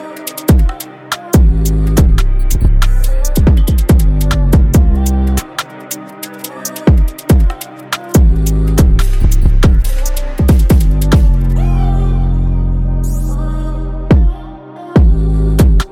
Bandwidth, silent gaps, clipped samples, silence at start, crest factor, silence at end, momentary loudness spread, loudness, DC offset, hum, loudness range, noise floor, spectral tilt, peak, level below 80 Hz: 16.5 kHz; none; under 0.1%; 0 s; 10 dB; 0.05 s; 12 LU; -13 LUFS; under 0.1%; none; 3 LU; -29 dBFS; -6.5 dB/octave; 0 dBFS; -12 dBFS